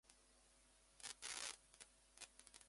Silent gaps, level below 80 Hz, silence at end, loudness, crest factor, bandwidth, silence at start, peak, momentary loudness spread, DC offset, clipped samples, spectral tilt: none; -80 dBFS; 0 s; -53 LUFS; 30 dB; 11.5 kHz; 0.05 s; -28 dBFS; 15 LU; under 0.1%; under 0.1%; 1 dB/octave